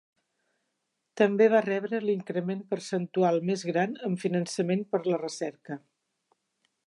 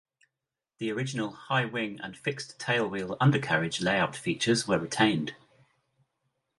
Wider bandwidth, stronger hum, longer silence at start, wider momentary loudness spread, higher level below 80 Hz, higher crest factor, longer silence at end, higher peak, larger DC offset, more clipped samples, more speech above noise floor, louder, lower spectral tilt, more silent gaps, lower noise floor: about the same, 11.5 kHz vs 11.5 kHz; neither; first, 1.15 s vs 0.8 s; first, 12 LU vs 9 LU; second, -82 dBFS vs -64 dBFS; about the same, 20 dB vs 22 dB; second, 1.1 s vs 1.25 s; about the same, -10 dBFS vs -8 dBFS; neither; neither; second, 53 dB vs 60 dB; about the same, -28 LUFS vs -29 LUFS; about the same, -6 dB/octave vs -5 dB/octave; neither; second, -81 dBFS vs -89 dBFS